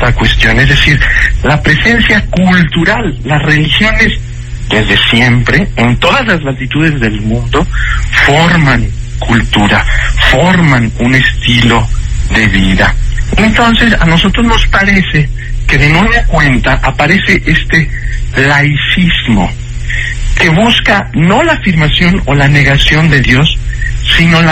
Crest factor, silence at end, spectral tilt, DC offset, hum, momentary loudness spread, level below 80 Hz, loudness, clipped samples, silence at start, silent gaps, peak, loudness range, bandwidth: 8 dB; 0 s; -5.5 dB/octave; under 0.1%; none; 8 LU; -16 dBFS; -8 LUFS; 1%; 0 s; none; 0 dBFS; 2 LU; 11 kHz